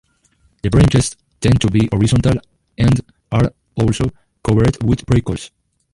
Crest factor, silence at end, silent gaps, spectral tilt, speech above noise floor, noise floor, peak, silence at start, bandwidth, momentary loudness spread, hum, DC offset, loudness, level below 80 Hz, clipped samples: 14 dB; 0.45 s; none; -6.5 dB/octave; 43 dB; -58 dBFS; -2 dBFS; 0.65 s; 11.5 kHz; 10 LU; none; under 0.1%; -17 LUFS; -30 dBFS; under 0.1%